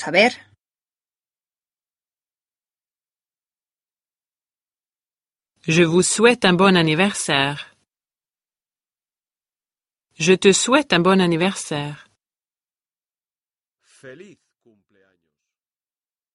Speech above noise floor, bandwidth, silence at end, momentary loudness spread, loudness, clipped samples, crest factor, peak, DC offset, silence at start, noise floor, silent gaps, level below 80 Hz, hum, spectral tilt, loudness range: over 73 dB; 11.5 kHz; 2.2 s; 13 LU; -17 LUFS; under 0.1%; 22 dB; 0 dBFS; under 0.1%; 0 s; under -90 dBFS; none; -62 dBFS; none; -4 dB/octave; 10 LU